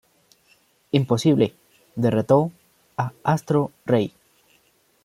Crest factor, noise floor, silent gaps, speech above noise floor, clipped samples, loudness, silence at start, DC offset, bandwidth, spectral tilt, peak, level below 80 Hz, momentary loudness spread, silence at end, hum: 20 dB; -62 dBFS; none; 42 dB; under 0.1%; -22 LUFS; 0.95 s; under 0.1%; 15.5 kHz; -7 dB/octave; -4 dBFS; -62 dBFS; 11 LU; 0.95 s; none